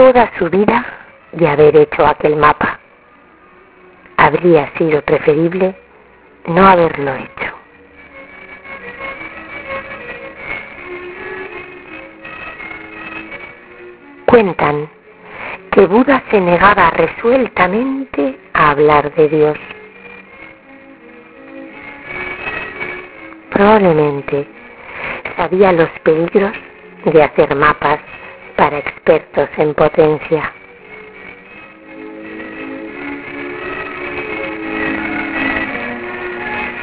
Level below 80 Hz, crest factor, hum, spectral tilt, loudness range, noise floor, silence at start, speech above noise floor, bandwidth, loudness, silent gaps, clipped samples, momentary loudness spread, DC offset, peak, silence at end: -42 dBFS; 16 dB; none; -10 dB/octave; 15 LU; -45 dBFS; 0 s; 33 dB; 4 kHz; -14 LUFS; none; 0.2%; 22 LU; under 0.1%; 0 dBFS; 0 s